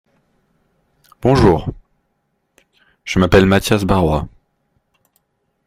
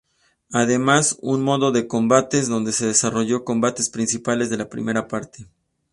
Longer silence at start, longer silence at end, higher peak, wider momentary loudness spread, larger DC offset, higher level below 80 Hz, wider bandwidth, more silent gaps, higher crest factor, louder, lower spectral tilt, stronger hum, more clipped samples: first, 1.25 s vs 0.5 s; first, 1.4 s vs 0.5 s; about the same, 0 dBFS vs 0 dBFS; first, 16 LU vs 8 LU; neither; first, -34 dBFS vs -58 dBFS; first, 16 kHz vs 11.5 kHz; neither; about the same, 18 dB vs 20 dB; first, -15 LUFS vs -20 LUFS; first, -6.5 dB/octave vs -4 dB/octave; neither; neither